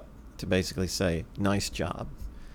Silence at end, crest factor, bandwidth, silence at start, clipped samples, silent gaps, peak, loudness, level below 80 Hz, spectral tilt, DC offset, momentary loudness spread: 0 s; 18 dB; 18.5 kHz; 0 s; under 0.1%; none; -14 dBFS; -30 LUFS; -44 dBFS; -5 dB/octave; under 0.1%; 13 LU